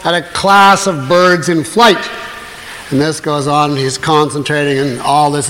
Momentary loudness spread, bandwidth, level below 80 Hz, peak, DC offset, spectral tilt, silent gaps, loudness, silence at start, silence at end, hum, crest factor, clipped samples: 14 LU; 16.5 kHz; -46 dBFS; 0 dBFS; under 0.1%; -4 dB/octave; none; -11 LUFS; 0 s; 0 s; none; 12 dB; under 0.1%